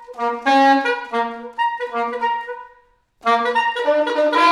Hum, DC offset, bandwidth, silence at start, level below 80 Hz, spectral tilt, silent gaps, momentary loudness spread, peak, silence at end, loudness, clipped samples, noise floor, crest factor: none; under 0.1%; 12 kHz; 0 s; -66 dBFS; -2.5 dB/octave; none; 10 LU; -4 dBFS; 0 s; -19 LUFS; under 0.1%; -55 dBFS; 16 dB